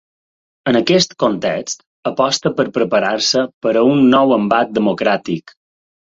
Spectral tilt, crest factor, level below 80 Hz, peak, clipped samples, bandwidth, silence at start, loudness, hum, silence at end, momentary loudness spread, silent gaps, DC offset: -4.5 dB/octave; 16 dB; -56 dBFS; 0 dBFS; under 0.1%; 7.8 kHz; 0.65 s; -15 LUFS; none; 0.7 s; 12 LU; 1.86-2.03 s, 3.54-3.61 s; under 0.1%